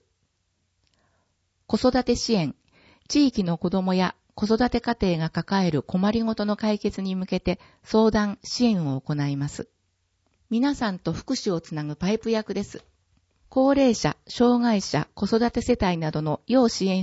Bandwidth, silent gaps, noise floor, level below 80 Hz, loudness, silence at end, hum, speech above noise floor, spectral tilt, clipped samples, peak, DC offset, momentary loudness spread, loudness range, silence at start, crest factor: 8 kHz; none; -73 dBFS; -48 dBFS; -24 LUFS; 0 s; none; 50 dB; -6 dB/octave; under 0.1%; -6 dBFS; under 0.1%; 9 LU; 5 LU; 1.7 s; 18 dB